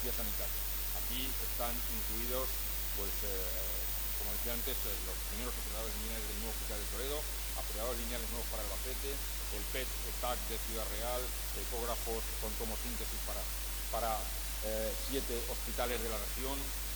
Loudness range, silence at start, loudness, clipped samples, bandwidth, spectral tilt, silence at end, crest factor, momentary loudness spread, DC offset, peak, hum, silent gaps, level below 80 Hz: 3 LU; 0 s; -36 LUFS; under 0.1%; over 20 kHz; -2.5 dB/octave; 0 s; 16 dB; 3 LU; under 0.1%; -20 dBFS; 50 Hz at -40 dBFS; none; -42 dBFS